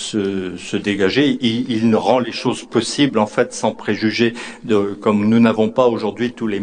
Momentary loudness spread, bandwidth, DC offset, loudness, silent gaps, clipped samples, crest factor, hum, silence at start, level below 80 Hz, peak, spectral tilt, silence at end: 7 LU; 10 kHz; under 0.1%; -17 LUFS; none; under 0.1%; 18 dB; none; 0 s; -54 dBFS; 0 dBFS; -5 dB/octave; 0 s